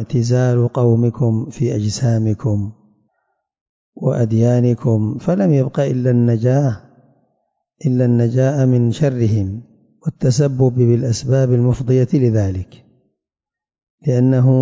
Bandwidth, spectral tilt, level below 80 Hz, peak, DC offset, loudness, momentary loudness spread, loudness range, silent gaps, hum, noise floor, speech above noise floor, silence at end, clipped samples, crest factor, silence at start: 7.8 kHz; -8 dB/octave; -42 dBFS; -4 dBFS; under 0.1%; -16 LUFS; 8 LU; 3 LU; 3.61-3.93 s, 13.83-13.98 s; none; -88 dBFS; 74 dB; 0 s; under 0.1%; 12 dB; 0 s